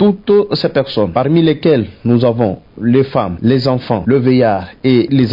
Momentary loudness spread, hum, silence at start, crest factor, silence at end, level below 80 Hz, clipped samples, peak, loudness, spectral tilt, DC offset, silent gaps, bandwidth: 5 LU; none; 0 s; 12 dB; 0 s; -46 dBFS; under 0.1%; 0 dBFS; -13 LUFS; -9.5 dB/octave; under 0.1%; none; 5.4 kHz